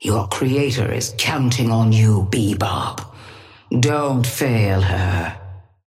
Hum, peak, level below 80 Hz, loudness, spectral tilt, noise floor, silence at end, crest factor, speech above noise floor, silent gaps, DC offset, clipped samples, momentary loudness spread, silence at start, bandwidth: none; -4 dBFS; -46 dBFS; -19 LUFS; -5.5 dB/octave; -42 dBFS; 0.25 s; 16 dB; 24 dB; none; under 0.1%; under 0.1%; 11 LU; 0 s; 16 kHz